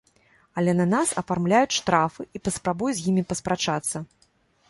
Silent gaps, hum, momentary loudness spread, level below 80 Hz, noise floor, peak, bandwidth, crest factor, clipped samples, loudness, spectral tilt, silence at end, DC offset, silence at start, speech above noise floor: none; none; 10 LU; -56 dBFS; -64 dBFS; -6 dBFS; 11.5 kHz; 20 dB; under 0.1%; -24 LUFS; -4.5 dB/octave; 0.65 s; under 0.1%; 0.55 s; 40 dB